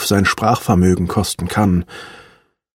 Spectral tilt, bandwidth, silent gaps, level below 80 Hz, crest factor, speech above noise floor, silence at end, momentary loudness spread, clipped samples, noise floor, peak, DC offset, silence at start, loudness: -5.5 dB/octave; 16.5 kHz; none; -38 dBFS; 16 dB; 36 dB; 0.55 s; 18 LU; under 0.1%; -51 dBFS; -2 dBFS; under 0.1%; 0 s; -16 LUFS